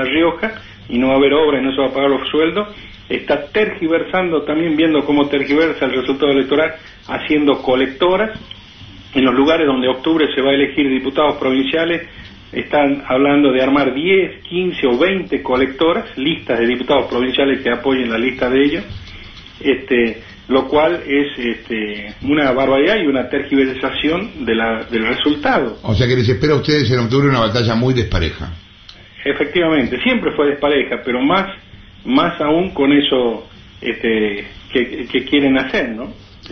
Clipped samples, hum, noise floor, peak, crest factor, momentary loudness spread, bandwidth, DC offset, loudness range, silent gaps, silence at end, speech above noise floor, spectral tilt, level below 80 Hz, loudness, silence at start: under 0.1%; none; -41 dBFS; 0 dBFS; 16 dB; 10 LU; 6.4 kHz; under 0.1%; 2 LU; none; 0 s; 25 dB; -7 dB/octave; -40 dBFS; -16 LUFS; 0 s